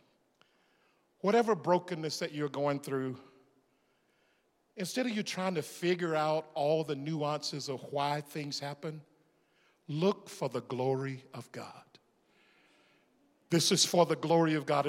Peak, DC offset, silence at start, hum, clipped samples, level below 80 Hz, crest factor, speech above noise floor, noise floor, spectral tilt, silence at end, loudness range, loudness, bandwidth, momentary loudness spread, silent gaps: -12 dBFS; under 0.1%; 1.25 s; none; under 0.1%; -86 dBFS; 22 dB; 41 dB; -73 dBFS; -4.5 dB/octave; 0 s; 5 LU; -32 LUFS; 16.5 kHz; 15 LU; none